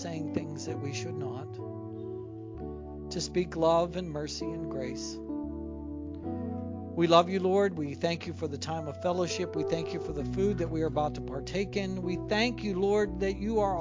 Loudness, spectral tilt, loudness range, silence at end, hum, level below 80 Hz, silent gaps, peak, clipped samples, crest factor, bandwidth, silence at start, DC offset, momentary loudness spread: -32 LUFS; -5.5 dB/octave; 6 LU; 0 s; none; -48 dBFS; none; -8 dBFS; under 0.1%; 24 dB; 7.6 kHz; 0 s; under 0.1%; 13 LU